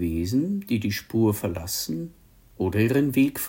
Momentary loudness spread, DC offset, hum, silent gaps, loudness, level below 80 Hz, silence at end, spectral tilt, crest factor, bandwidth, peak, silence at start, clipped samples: 9 LU; under 0.1%; none; none; -25 LUFS; -52 dBFS; 0 s; -5.5 dB/octave; 14 dB; 17 kHz; -10 dBFS; 0 s; under 0.1%